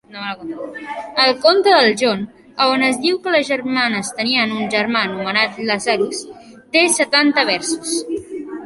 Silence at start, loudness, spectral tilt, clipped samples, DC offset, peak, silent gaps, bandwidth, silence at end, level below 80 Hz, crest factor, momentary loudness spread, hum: 0.1 s; -16 LUFS; -2.5 dB/octave; under 0.1%; under 0.1%; 0 dBFS; none; 12 kHz; 0 s; -60 dBFS; 18 dB; 16 LU; none